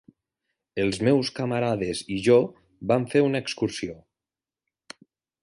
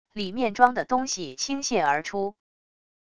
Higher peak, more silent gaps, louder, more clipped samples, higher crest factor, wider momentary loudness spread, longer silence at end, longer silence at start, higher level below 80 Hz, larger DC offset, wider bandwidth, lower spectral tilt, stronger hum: second, -6 dBFS vs -2 dBFS; neither; about the same, -24 LUFS vs -25 LUFS; neither; about the same, 20 dB vs 24 dB; first, 13 LU vs 10 LU; first, 1.45 s vs 0.7 s; first, 0.75 s vs 0.05 s; about the same, -58 dBFS vs -62 dBFS; second, under 0.1% vs 0.5%; about the same, 11.5 kHz vs 11 kHz; first, -6 dB/octave vs -3 dB/octave; neither